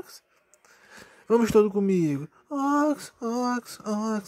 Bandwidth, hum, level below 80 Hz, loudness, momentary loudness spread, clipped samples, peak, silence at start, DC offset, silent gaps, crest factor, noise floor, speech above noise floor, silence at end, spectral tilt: 15.5 kHz; none; -60 dBFS; -25 LUFS; 11 LU; under 0.1%; -10 dBFS; 0.1 s; under 0.1%; none; 18 dB; -62 dBFS; 37 dB; 0 s; -6.5 dB/octave